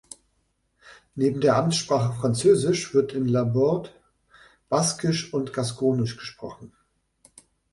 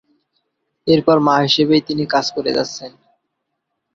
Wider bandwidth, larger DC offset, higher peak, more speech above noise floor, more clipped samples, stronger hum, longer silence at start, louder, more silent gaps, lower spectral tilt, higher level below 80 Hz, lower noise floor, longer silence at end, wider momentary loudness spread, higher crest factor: first, 11.5 kHz vs 7.6 kHz; neither; second, -8 dBFS vs -2 dBFS; second, 48 dB vs 59 dB; neither; neither; about the same, 0.85 s vs 0.85 s; second, -23 LUFS vs -16 LUFS; neither; about the same, -5.5 dB/octave vs -5 dB/octave; about the same, -58 dBFS vs -56 dBFS; second, -71 dBFS vs -75 dBFS; about the same, 1.05 s vs 1.05 s; first, 16 LU vs 13 LU; about the same, 18 dB vs 18 dB